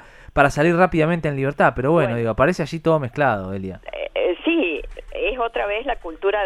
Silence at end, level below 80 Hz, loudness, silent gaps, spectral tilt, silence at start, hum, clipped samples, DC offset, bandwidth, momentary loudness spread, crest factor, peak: 0 s; -40 dBFS; -20 LUFS; none; -6.5 dB/octave; 0.2 s; none; under 0.1%; under 0.1%; 12.5 kHz; 11 LU; 18 dB; -2 dBFS